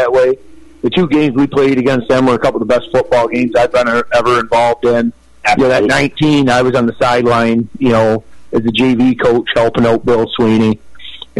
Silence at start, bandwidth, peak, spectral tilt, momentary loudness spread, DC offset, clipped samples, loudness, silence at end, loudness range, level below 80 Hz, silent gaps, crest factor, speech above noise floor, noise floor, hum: 0 s; 11.5 kHz; -2 dBFS; -6 dB/octave; 5 LU; under 0.1%; under 0.1%; -12 LUFS; 0 s; 1 LU; -40 dBFS; none; 10 dB; 21 dB; -32 dBFS; none